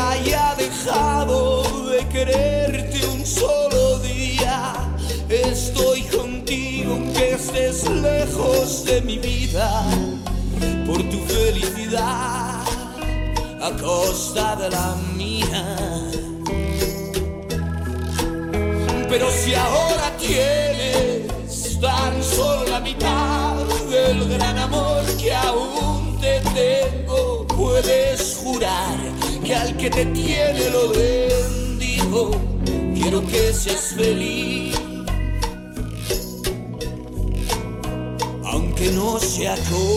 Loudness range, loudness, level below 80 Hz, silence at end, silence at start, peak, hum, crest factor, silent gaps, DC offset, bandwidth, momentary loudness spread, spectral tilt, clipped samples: 4 LU; -21 LUFS; -28 dBFS; 0 s; 0 s; -4 dBFS; none; 16 dB; none; under 0.1%; 16.5 kHz; 8 LU; -4.5 dB/octave; under 0.1%